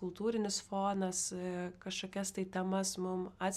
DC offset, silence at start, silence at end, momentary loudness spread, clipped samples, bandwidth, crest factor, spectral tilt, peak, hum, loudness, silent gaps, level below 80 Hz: under 0.1%; 0 s; 0 s; 6 LU; under 0.1%; 15 kHz; 14 dB; -4 dB/octave; -24 dBFS; none; -37 LUFS; none; -70 dBFS